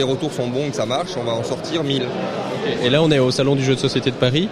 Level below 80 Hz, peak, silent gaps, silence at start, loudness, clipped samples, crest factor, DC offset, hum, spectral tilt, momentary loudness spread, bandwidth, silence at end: -52 dBFS; -2 dBFS; none; 0 s; -20 LUFS; under 0.1%; 18 dB; under 0.1%; none; -5.5 dB/octave; 7 LU; 13.5 kHz; 0 s